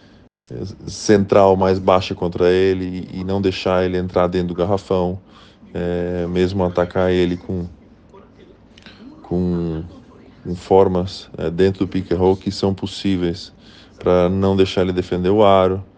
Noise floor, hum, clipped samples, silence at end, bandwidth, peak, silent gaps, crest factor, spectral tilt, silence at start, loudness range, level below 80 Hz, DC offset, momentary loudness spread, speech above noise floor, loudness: -46 dBFS; none; under 0.1%; 0.15 s; 9.2 kHz; 0 dBFS; none; 18 dB; -7 dB/octave; 0.5 s; 5 LU; -48 dBFS; under 0.1%; 16 LU; 28 dB; -18 LUFS